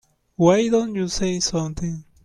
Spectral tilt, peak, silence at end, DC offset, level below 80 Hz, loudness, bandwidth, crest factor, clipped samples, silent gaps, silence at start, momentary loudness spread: -5 dB/octave; -4 dBFS; 0.25 s; under 0.1%; -42 dBFS; -21 LUFS; 12 kHz; 16 dB; under 0.1%; none; 0.4 s; 13 LU